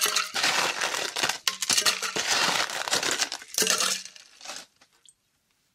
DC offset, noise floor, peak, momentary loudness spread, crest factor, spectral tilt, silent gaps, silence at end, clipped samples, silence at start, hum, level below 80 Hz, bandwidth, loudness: under 0.1%; -71 dBFS; -4 dBFS; 17 LU; 24 dB; 0.5 dB/octave; none; 1.1 s; under 0.1%; 0 s; none; -70 dBFS; 16 kHz; -24 LUFS